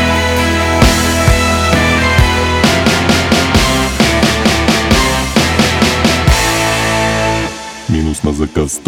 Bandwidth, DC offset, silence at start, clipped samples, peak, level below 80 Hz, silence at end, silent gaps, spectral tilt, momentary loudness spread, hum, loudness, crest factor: 18.5 kHz; under 0.1%; 0 s; under 0.1%; 0 dBFS; -20 dBFS; 0.05 s; none; -4 dB/octave; 6 LU; none; -11 LUFS; 12 dB